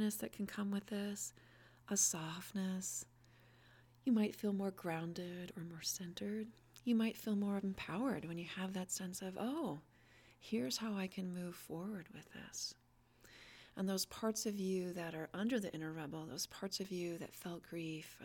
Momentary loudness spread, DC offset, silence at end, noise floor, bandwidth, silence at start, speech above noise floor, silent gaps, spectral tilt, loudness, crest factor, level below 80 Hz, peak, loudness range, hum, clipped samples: 11 LU; under 0.1%; 0 s; -68 dBFS; 18 kHz; 0 s; 26 dB; none; -4 dB/octave; -42 LUFS; 20 dB; -76 dBFS; -22 dBFS; 5 LU; none; under 0.1%